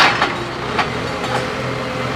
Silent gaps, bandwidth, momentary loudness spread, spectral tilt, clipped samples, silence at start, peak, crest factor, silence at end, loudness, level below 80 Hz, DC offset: none; 16 kHz; 5 LU; -4 dB/octave; under 0.1%; 0 s; 0 dBFS; 18 dB; 0 s; -20 LUFS; -42 dBFS; under 0.1%